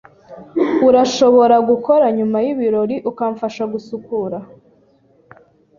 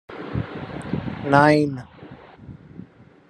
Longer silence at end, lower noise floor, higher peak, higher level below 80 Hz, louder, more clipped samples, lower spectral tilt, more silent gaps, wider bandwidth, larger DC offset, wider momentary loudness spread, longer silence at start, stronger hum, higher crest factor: first, 1.35 s vs 0.45 s; first, -54 dBFS vs -44 dBFS; about the same, 0 dBFS vs 0 dBFS; second, -58 dBFS vs -50 dBFS; first, -16 LUFS vs -21 LUFS; neither; second, -5.5 dB/octave vs -7.5 dB/octave; neither; second, 7.4 kHz vs 11 kHz; neither; second, 13 LU vs 27 LU; first, 0.3 s vs 0.1 s; neither; second, 16 dB vs 24 dB